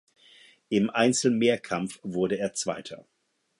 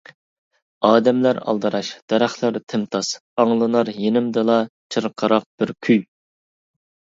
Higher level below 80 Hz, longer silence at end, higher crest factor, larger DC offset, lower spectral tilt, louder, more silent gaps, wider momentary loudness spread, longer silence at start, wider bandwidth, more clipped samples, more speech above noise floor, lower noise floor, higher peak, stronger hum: about the same, -68 dBFS vs -68 dBFS; second, 0.6 s vs 1.15 s; about the same, 20 dB vs 20 dB; neither; about the same, -4.5 dB/octave vs -5.5 dB/octave; second, -26 LUFS vs -20 LUFS; second, none vs 2.02-2.08 s, 2.63-2.67 s, 3.20-3.37 s, 4.69-4.90 s, 5.46-5.58 s; first, 12 LU vs 8 LU; about the same, 0.7 s vs 0.8 s; first, 11.5 kHz vs 7.8 kHz; neither; second, 30 dB vs over 71 dB; second, -56 dBFS vs under -90 dBFS; second, -8 dBFS vs 0 dBFS; neither